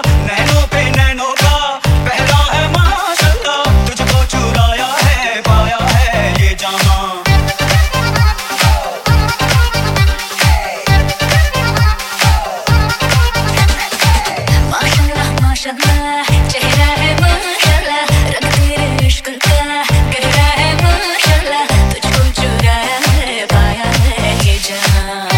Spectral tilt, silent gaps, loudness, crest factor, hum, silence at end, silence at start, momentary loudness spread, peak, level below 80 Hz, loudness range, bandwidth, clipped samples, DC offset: -4 dB/octave; none; -12 LUFS; 12 dB; none; 0 s; 0 s; 2 LU; 0 dBFS; -16 dBFS; 1 LU; 17 kHz; under 0.1%; under 0.1%